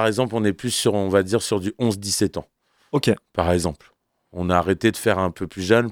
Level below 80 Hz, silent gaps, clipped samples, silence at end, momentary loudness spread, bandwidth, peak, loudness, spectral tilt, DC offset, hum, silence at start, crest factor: -46 dBFS; none; under 0.1%; 0 s; 9 LU; 18.5 kHz; -2 dBFS; -22 LUFS; -5 dB/octave; under 0.1%; none; 0 s; 20 dB